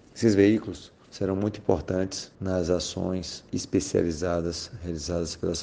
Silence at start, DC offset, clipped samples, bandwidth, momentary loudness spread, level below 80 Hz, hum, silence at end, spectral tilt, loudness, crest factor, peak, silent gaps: 0.15 s; under 0.1%; under 0.1%; 10 kHz; 12 LU; -48 dBFS; none; 0 s; -5.5 dB/octave; -27 LUFS; 20 dB; -6 dBFS; none